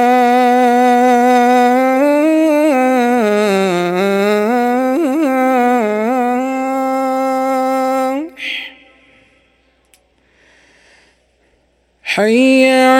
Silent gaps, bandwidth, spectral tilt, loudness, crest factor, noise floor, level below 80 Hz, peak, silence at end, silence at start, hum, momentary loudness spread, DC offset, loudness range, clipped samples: none; 17 kHz; -5 dB/octave; -13 LUFS; 14 dB; -57 dBFS; -60 dBFS; 0 dBFS; 0 s; 0 s; none; 7 LU; under 0.1%; 12 LU; under 0.1%